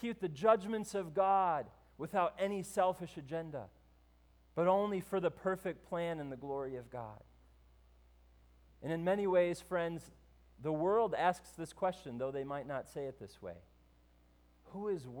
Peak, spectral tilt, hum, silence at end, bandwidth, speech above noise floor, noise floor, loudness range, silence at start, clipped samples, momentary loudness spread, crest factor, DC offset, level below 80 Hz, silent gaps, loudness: -16 dBFS; -6 dB/octave; none; 0 s; over 20 kHz; 31 dB; -67 dBFS; 8 LU; 0 s; under 0.1%; 17 LU; 20 dB; under 0.1%; -66 dBFS; none; -36 LUFS